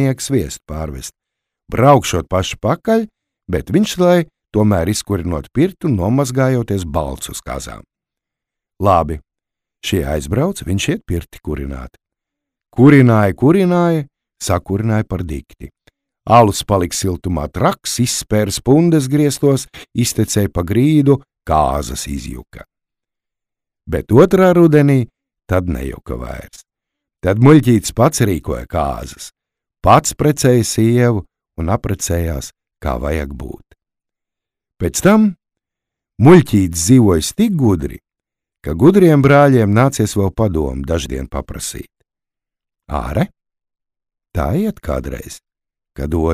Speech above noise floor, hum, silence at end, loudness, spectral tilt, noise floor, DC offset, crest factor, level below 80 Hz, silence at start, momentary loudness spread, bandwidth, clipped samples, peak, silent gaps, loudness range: 70 dB; none; 0 s; -15 LUFS; -6 dB/octave; -84 dBFS; under 0.1%; 16 dB; -34 dBFS; 0 s; 17 LU; 16 kHz; under 0.1%; 0 dBFS; none; 8 LU